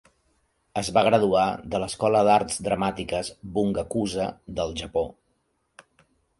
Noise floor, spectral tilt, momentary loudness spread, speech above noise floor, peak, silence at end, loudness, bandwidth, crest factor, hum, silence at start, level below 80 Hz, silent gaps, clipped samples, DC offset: -72 dBFS; -5 dB/octave; 11 LU; 48 dB; -6 dBFS; 1.3 s; -25 LUFS; 11.5 kHz; 20 dB; none; 0.75 s; -50 dBFS; none; under 0.1%; under 0.1%